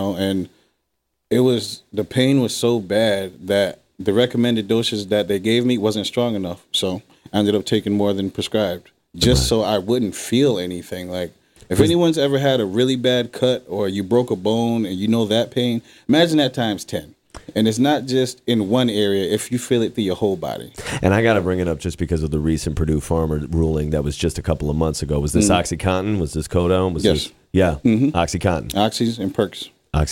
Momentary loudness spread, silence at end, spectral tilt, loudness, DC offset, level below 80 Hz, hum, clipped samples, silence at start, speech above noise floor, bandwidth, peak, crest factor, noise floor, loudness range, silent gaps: 8 LU; 0 s; -5.5 dB/octave; -20 LUFS; under 0.1%; -38 dBFS; none; under 0.1%; 0 s; 55 dB; 16.5 kHz; -2 dBFS; 18 dB; -74 dBFS; 2 LU; none